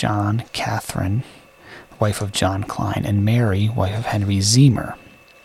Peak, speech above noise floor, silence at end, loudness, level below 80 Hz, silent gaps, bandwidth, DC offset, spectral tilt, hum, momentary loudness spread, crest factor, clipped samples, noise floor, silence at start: -2 dBFS; 24 dB; 0.45 s; -20 LUFS; -46 dBFS; none; 15 kHz; under 0.1%; -5.5 dB/octave; none; 10 LU; 16 dB; under 0.1%; -43 dBFS; 0 s